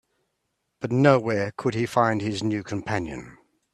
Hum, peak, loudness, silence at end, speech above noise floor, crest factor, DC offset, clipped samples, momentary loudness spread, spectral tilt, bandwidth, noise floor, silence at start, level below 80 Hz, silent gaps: none; -4 dBFS; -24 LUFS; 0.4 s; 53 dB; 22 dB; under 0.1%; under 0.1%; 13 LU; -6.5 dB/octave; 12.5 kHz; -77 dBFS; 0.8 s; -58 dBFS; none